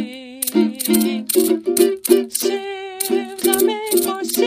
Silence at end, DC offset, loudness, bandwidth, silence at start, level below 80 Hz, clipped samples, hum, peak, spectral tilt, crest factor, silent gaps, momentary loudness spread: 0 s; under 0.1%; -18 LUFS; 15.5 kHz; 0 s; -62 dBFS; under 0.1%; none; 0 dBFS; -3 dB/octave; 18 dB; none; 8 LU